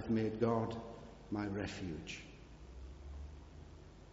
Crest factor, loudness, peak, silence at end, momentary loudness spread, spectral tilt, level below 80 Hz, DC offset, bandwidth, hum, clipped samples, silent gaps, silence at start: 20 dB; -41 LUFS; -20 dBFS; 0 s; 21 LU; -6.5 dB/octave; -56 dBFS; under 0.1%; 7.6 kHz; none; under 0.1%; none; 0 s